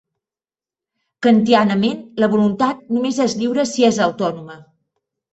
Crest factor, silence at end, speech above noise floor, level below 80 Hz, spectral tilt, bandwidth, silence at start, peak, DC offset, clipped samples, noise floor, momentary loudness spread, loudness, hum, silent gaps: 16 dB; 0.7 s; over 74 dB; -60 dBFS; -5.5 dB/octave; 8.2 kHz; 1.2 s; -2 dBFS; under 0.1%; under 0.1%; under -90 dBFS; 7 LU; -17 LUFS; none; none